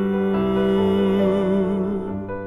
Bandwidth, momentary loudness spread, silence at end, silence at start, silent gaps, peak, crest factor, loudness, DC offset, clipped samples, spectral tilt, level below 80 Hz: 3.9 kHz; 6 LU; 0 s; 0 s; none; -8 dBFS; 12 dB; -20 LUFS; under 0.1%; under 0.1%; -9 dB/octave; -44 dBFS